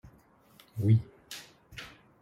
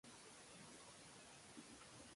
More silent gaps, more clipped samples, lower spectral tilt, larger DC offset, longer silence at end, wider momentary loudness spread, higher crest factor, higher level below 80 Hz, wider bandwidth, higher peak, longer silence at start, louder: neither; neither; first, -7 dB/octave vs -2.5 dB/octave; neither; first, 0.35 s vs 0 s; first, 20 LU vs 1 LU; about the same, 20 dB vs 16 dB; first, -62 dBFS vs -82 dBFS; first, 14 kHz vs 11.5 kHz; first, -14 dBFS vs -44 dBFS; first, 0.75 s vs 0.05 s; first, -28 LUFS vs -60 LUFS